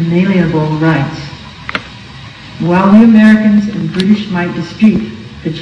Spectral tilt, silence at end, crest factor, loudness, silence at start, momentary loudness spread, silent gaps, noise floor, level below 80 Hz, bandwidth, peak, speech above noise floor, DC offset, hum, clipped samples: -8 dB/octave; 0 s; 10 dB; -10 LUFS; 0 s; 21 LU; none; -30 dBFS; -40 dBFS; 7.6 kHz; 0 dBFS; 21 dB; under 0.1%; none; 2%